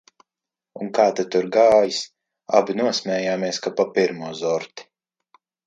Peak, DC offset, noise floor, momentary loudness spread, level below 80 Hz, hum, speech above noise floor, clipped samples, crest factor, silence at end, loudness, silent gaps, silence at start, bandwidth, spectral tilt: 0 dBFS; under 0.1%; -88 dBFS; 12 LU; -66 dBFS; none; 68 dB; under 0.1%; 22 dB; 0.85 s; -21 LUFS; none; 0.75 s; 9.2 kHz; -4 dB/octave